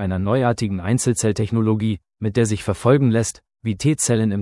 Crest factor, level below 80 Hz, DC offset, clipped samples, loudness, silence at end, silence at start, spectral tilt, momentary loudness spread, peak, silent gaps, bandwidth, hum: 16 dB; -50 dBFS; under 0.1%; under 0.1%; -20 LUFS; 0 s; 0 s; -6 dB/octave; 9 LU; -2 dBFS; none; 12 kHz; none